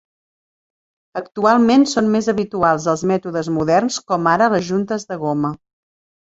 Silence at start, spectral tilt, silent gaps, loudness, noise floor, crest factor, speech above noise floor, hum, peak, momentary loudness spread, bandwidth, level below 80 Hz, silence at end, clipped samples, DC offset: 1.15 s; -5.5 dB/octave; none; -17 LUFS; under -90 dBFS; 16 dB; over 73 dB; none; -2 dBFS; 10 LU; 8 kHz; -56 dBFS; 0.65 s; under 0.1%; under 0.1%